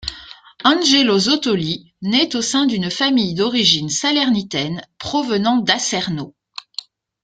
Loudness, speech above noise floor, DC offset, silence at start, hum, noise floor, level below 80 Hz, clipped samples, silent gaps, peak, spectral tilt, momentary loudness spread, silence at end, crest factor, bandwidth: -17 LUFS; 22 dB; under 0.1%; 0 s; none; -40 dBFS; -52 dBFS; under 0.1%; none; 0 dBFS; -3.5 dB/octave; 16 LU; 0.95 s; 18 dB; 9.4 kHz